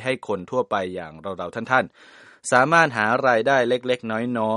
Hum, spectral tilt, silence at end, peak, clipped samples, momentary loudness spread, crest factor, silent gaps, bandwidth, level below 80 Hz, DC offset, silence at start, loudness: none; -4.5 dB/octave; 0 s; -2 dBFS; under 0.1%; 15 LU; 20 dB; none; 11.5 kHz; -64 dBFS; under 0.1%; 0 s; -21 LUFS